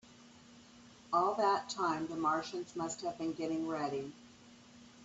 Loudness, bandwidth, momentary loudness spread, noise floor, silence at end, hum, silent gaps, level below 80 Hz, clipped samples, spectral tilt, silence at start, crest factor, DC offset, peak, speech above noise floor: -36 LUFS; 8.2 kHz; 10 LU; -59 dBFS; 0 s; none; none; -76 dBFS; under 0.1%; -4.5 dB/octave; 0.05 s; 20 dB; under 0.1%; -18 dBFS; 23 dB